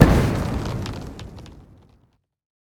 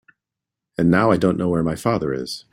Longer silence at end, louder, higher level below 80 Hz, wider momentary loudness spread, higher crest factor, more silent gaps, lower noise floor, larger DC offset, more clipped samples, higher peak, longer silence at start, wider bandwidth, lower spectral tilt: first, 1.1 s vs 0.15 s; second, -23 LUFS vs -20 LUFS; first, -30 dBFS vs -50 dBFS; first, 23 LU vs 10 LU; about the same, 22 dB vs 18 dB; neither; second, -63 dBFS vs -85 dBFS; neither; first, 0.1% vs under 0.1%; about the same, 0 dBFS vs -2 dBFS; second, 0 s vs 0.8 s; first, 18.5 kHz vs 15.5 kHz; about the same, -7 dB/octave vs -7 dB/octave